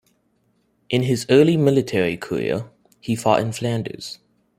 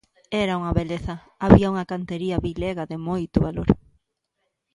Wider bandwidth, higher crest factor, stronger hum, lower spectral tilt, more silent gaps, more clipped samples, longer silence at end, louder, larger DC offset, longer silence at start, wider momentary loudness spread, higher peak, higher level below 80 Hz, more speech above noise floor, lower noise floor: first, 15.5 kHz vs 11 kHz; about the same, 20 dB vs 22 dB; neither; second, -6 dB/octave vs -8 dB/octave; neither; neither; second, 0.45 s vs 1 s; first, -20 LUFS vs -23 LUFS; neither; first, 0.9 s vs 0.3 s; first, 19 LU vs 13 LU; about the same, -2 dBFS vs 0 dBFS; second, -58 dBFS vs -36 dBFS; second, 46 dB vs 55 dB; second, -65 dBFS vs -77 dBFS